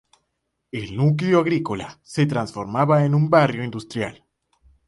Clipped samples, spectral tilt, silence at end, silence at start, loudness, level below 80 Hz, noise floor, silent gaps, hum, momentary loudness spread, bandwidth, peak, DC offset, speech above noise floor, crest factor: under 0.1%; -7.5 dB/octave; 0.75 s; 0.75 s; -21 LUFS; -56 dBFS; -76 dBFS; none; none; 13 LU; 11.5 kHz; -4 dBFS; under 0.1%; 56 dB; 18 dB